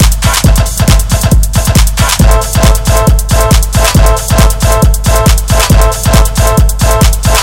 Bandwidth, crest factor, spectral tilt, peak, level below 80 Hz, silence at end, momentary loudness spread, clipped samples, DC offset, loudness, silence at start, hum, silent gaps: 17.5 kHz; 6 dB; -4.5 dB/octave; 0 dBFS; -8 dBFS; 0 s; 2 LU; 0.4%; under 0.1%; -8 LUFS; 0 s; none; none